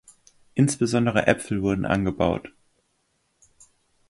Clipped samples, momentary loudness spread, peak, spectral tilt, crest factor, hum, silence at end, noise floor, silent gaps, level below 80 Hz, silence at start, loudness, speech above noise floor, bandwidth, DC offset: under 0.1%; 4 LU; -4 dBFS; -6 dB/octave; 22 dB; none; 1.6 s; -71 dBFS; none; -48 dBFS; 0.55 s; -23 LUFS; 48 dB; 11.5 kHz; under 0.1%